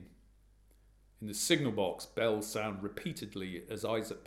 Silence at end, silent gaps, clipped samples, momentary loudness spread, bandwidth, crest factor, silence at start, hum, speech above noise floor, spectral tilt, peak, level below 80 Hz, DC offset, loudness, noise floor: 0 s; none; under 0.1%; 12 LU; 16 kHz; 24 dB; 0 s; 50 Hz at -60 dBFS; 29 dB; -4 dB/octave; -12 dBFS; -64 dBFS; under 0.1%; -35 LUFS; -64 dBFS